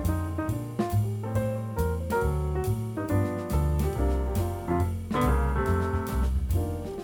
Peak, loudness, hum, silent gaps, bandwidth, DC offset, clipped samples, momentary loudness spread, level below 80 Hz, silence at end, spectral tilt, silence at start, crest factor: -12 dBFS; -28 LUFS; none; none; 19 kHz; under 0.1%; under 0.1%; 4 LU; -32 dBFS; 0 s; -7.5 dB/octave; 0 s; 14 dB